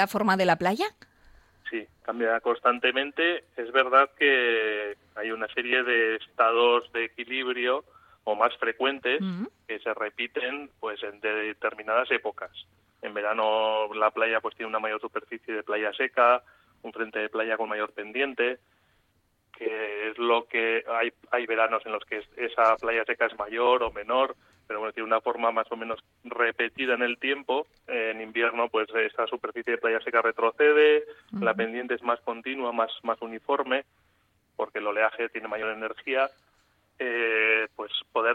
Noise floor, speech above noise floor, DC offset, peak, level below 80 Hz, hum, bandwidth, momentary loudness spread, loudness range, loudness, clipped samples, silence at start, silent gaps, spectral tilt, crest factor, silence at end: -70 dBFS; 43 dB; under 0.1%; -6 dBFS; -68 dBFS; none; 15 kHz; 12 LU; 6 LU; -27 LUFS; under 0.1%; 0 s; none; -5 dB/octave; 22 dB; 0 s